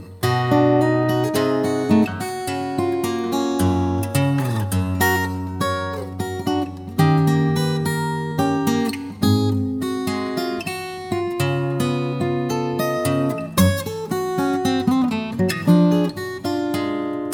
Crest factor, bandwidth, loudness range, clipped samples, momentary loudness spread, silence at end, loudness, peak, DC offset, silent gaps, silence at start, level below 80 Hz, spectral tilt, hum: 16 dB; over 20 kHz; 3 LU; under 0.1%; 8 LU; 0 s; -21 LUFS; -4 dBFS; under 0.1%; none; 0 s; -52 dBFS; -6 dB/octave; none